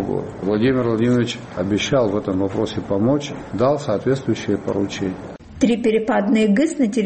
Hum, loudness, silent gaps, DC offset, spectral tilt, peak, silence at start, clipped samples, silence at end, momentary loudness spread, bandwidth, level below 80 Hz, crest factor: none; -20 LUFS; none; under 0.1%; -6.5 dB/octave; -2 dBFS; 0 s; under 0.1%; 0 s; 8 LU; 8.8 kHz; -48 dBFS; 16 dB